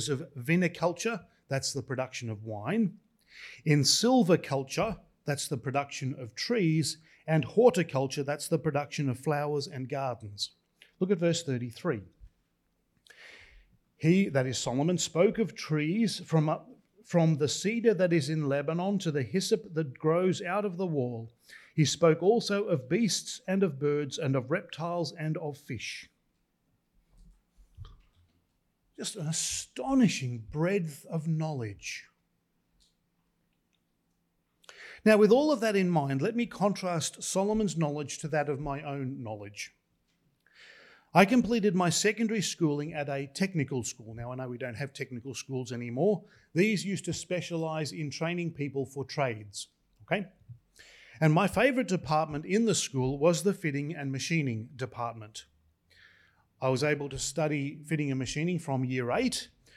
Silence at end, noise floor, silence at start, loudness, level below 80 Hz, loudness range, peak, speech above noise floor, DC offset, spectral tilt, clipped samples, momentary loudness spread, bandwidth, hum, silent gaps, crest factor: 0.3 s; -76 dBFS; 0 s; -30 LUFS; -62 dBFS; 7 LU; -8 dBFS; 47 dB; under 0.1%; -5 dB/octave; under 0.1%; 13 LU; 14.5 kHz; none; none; 24 dB